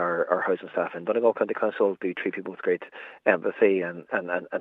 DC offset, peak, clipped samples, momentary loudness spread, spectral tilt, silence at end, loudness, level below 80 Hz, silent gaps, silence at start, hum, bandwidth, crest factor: under 0.1%; -6 dBFS; under 0.1%; 8 LU; -8.5 dB/octave; 0 s; -26 LUFS; -84 dBFS; none; 0 s; none; 4 kHz; 20 dB